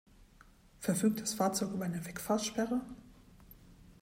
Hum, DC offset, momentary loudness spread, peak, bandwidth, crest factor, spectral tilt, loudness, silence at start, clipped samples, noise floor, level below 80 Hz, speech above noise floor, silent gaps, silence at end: none; under 0.1%; 9 LU; -18 dBFS; 16 kHz; 18 dB; -4.5 dB/octave; -34 LUFS; 0.2 s; under 0.1%; -61 dBFS; -62 dBFS; 27 dB; none; 0.1 s